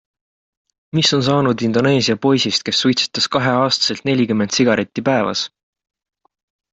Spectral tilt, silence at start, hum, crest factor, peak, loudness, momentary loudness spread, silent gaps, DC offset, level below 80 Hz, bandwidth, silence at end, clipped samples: -4.5 dB/octave; 0.95 s; none; 16 dB; -2 dBFS; -16 LUFS; 3 LU; none; under 0.1%; -56 dBFS; 8.4 kHz; 1.25 s; under 0.1%